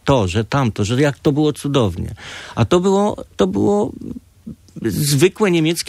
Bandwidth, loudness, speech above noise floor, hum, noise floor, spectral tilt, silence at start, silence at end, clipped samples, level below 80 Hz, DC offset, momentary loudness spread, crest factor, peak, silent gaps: 15.5 kHz; -17 LUFS; 21 dB; none; -38 dBFS; -5.5 dB/octave; 0.05 s; 0 s; under 0.1%; -42 dBFS; under 0.1%; 17 LU; 16 dB; -2 dBFS; none